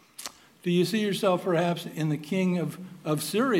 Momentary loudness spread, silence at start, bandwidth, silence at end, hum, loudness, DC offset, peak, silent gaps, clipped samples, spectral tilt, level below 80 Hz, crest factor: 12 LU; 0.2 s; 16 kHz; 0 s; none; -27 LUFS; under 0.1%; -10 dBFS; none; under 0.1%; -5.5 dB/octave; -80 dBFS; 16 dB